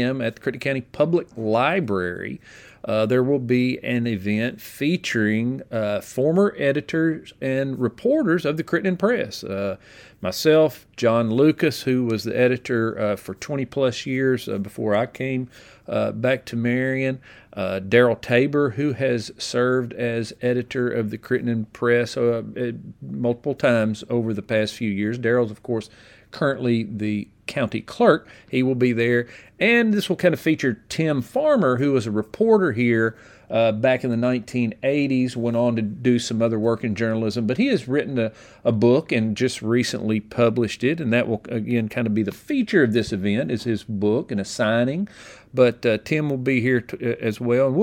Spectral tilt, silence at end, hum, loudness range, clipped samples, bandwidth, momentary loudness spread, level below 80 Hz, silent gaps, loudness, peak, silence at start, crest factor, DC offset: -6.5 dB/octave; 0 s; none; 3 LU; under 0.1%; 17 kHz; 8 LU; -58 dBFS; none; -22 LUFS; -2 dBFS; 0 s; 20 dB; under 0.1%